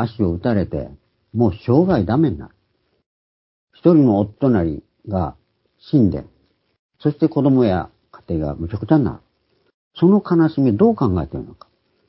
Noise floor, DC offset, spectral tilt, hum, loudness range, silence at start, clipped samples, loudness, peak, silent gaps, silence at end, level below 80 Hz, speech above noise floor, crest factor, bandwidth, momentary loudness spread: -66 dBFS; under 0.1%; -13.5 dB/octave; none; 2 LU; 0 s; under 0.1%; -18 LUFS; 0 dBFS; 3.06-3.68 s, 6.79-6.89 s, 9.74-9.91 s; 0.6 s; -40 dBFS; 49 dB; 18 dB; 5.8 kHz; 14 LU